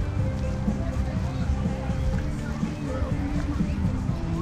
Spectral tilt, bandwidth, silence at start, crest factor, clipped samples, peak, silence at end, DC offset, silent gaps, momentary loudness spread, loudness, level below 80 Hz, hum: -7.5 dB/octave; 10.5 kHz; 0 s; 14 dB; under 0.1%; -12 dBFS; 0 s; under 0.1%; none; 3 LU; -28 LUFS; -30 dBFS; none